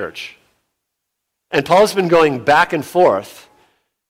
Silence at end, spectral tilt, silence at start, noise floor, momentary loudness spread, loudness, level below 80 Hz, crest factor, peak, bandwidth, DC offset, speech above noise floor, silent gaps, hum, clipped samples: 0.8 s; -5 dB/octave; 0 s; -77 dBFS; 14 LU; -14 LUFS; -56 dBFS; 14 dB; -2 dBFS; 16.5 kHz; under 0.1%; 62 dB; none; none; under 0.1%